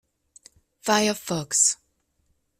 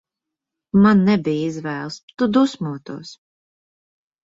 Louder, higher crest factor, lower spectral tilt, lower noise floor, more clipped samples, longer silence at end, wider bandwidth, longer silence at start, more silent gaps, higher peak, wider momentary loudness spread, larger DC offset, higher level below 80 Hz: second, -22 LUFS vs -19 LUFS; about the same, 20 dB vs 16 dB; second, -2 dB/octave vs -7 dB/octave; second, -71 dBFS vs -84 dBFS; neither; second, 0.85 s vs 1.1 s; first, 16 kHz vs 7.8 kHz; about the same, 0.85 s vs 0.75 s; second, none vs 2.03-2.08 s; about the same, -6 dBFS vs -4 dBFS; second, 13 LU vs 18 LU; neither; second, -66 dBFS vs -56 dBFS